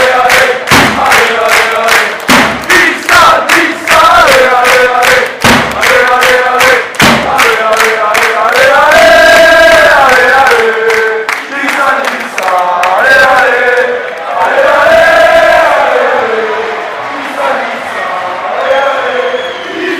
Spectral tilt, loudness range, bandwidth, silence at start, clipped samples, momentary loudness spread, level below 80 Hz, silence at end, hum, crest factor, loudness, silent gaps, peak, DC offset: -2.5 dB/octave; 5 LU; 16.5 kHz; 0 s; 2%; 10 LU; -36 dBFS; 0 s; none; 6 dB; -6 LUFS; none; 0 dBFS; under 0.1%